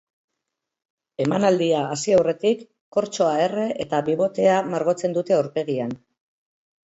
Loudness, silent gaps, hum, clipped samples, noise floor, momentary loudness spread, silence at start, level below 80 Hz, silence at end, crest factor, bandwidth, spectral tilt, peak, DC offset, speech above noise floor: -22 LUFS; 2.81-2.92 s; none; under 0.1%; -82 dBFS; 8 LU; 1.2 s; -64 dBFS; 0.9 s; 18 dB; 8 kHz; -5.5 dB/octave; -6 dBFS; under 0.1%; 61 dB